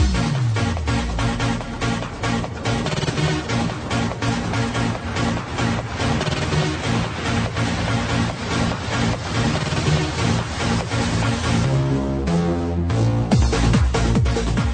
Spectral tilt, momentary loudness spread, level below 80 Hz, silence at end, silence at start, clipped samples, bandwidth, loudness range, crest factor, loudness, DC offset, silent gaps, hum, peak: -5.5 dB/octave; 5 LU; -28 dBFS; 0 s; 0 s; under 0.1%; 9.4 kHz; 3 LU; 14 dB; -21 LUFS; under 0.1%; none; none; -6 dBFS